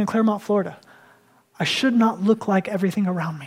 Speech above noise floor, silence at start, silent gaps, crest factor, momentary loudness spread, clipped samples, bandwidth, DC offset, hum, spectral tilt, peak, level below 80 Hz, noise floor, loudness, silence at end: 35 dB; 0 s; none; 16 dB; 5 LU; under 0.1%; 15 kHz; under 0.1%; none; -6 dB/octave; -6 dBFS; -70 dBFS; -56 dBFS; -21 LUFS; 0 s